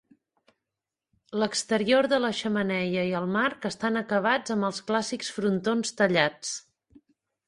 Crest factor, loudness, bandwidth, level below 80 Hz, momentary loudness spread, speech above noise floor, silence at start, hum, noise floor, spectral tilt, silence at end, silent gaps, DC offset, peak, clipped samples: 22 dB; -26 LUFS; 11.5 kHz; -68 dBFS; 7 LU; 62 dB; 1.3 s; none; -88 dBFS; -4 dB/octave; 0.85 s; none; under 0.1%; -6 dBFS; under 0.1%